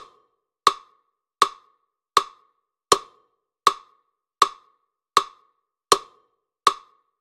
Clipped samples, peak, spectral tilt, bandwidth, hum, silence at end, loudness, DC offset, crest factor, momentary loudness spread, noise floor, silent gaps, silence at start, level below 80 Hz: under 0.1%; 0 dBFS; -0.5 dB/octave; 16 kHz; none; 0.45 s; -23 LUFS; under 0.1%; 26 dB; 17 LU; -69 dBFS; none; 0.65 s; -66 dBFS